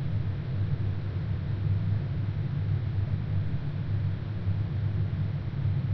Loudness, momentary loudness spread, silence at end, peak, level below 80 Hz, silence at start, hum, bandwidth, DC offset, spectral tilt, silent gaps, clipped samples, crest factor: -31 LUFS; 3 LU; 0 s; -16 dBFS; -42 dBFS; 0 s; none; 5.2 kHz; under 0.1%; -10 dB/octave; none; under 0.1%; 12 dB